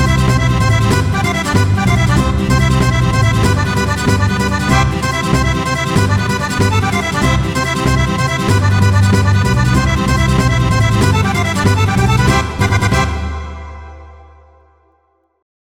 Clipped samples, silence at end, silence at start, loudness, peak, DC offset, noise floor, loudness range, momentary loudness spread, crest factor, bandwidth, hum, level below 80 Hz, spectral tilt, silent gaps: under 0.1%; 1.55 s; 0 s; -13 LUFS; 0 dBFS; under 0.1%; -59 dBFS; 3 LU; 3 LU; 14 dB; 16 kHz; none; -22 dBFS; -5.5 dB/octave; none